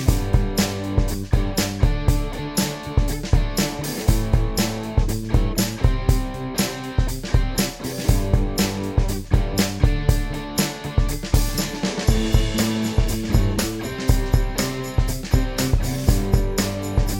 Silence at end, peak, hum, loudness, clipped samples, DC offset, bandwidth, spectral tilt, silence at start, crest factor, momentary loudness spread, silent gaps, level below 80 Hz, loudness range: 0 s; -2 dBFS; none; -22 LUFS; under 0.1%; under 0.1%; 17 kHz; -5 dB/octave; 0 s; 18 dB; 4 LU; none; -24 dBFS; 1 LU